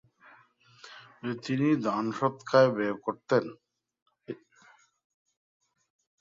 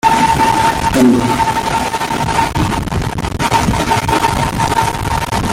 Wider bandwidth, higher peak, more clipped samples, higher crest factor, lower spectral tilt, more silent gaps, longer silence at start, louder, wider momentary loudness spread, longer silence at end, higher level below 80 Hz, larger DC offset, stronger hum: second, 7.6 kHz vs 17 kHz; second, -10 dBFS vs 0 dBFS; neither; first, 22 dB vs 12 dB; first, -7 dB/octave vs -4.5 dB/octave; first, 4.02-4.06 s vs none; first, 0.85 s vs 0.05 s; second, -28 LUFS vs -14 LUFS; first, 21 LU vs 6 LU; first, 1.85 s vs 0 s; second, -74 dBFS vs -28 dBFS; neither; neither